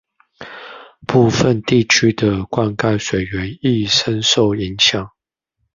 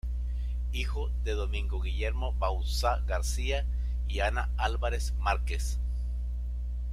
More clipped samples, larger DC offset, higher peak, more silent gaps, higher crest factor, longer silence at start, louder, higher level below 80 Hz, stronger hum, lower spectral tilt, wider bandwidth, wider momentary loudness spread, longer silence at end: neither; neither; first, 0 dBFS vs -12 dBFS; neither; about the same, 18 dB vs 18 dB; first, 0.4 s vs 0.05 s; first, -16 LUFS vs -32 LUFS; second, -42 dBFS vs -30 dBFS; second, none vs 60 Hz at -30 dBFS; about the same, -4.5 dB/octave vs -4.5 dB/octave; second, 7.4 kHz vs 13 kHz; first, 20 LU vs 5 LU; first, 0.7 s vs 0 s